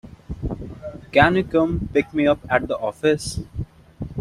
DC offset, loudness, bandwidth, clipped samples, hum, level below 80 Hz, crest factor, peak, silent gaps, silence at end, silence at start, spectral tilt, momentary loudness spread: under 0.1%; -21 LUFS; 13 kHz; under 0.1%; none; -40 dBFS; 20 dB; -2 dBFS; none; 0 s; 0.05 s; -6 dB/octave; 18 LU